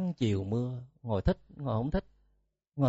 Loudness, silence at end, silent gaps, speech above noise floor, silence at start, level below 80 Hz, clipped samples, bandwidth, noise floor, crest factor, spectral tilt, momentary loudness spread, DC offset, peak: -33 LUFS; 0 s; none; 42 dB; 0 s; -46 dBFS; under 0.1%; 8 kHz; -74 dBFS; 20 dB; -8 dB/octave; 7 LU; under 0.1%; -12 dBFS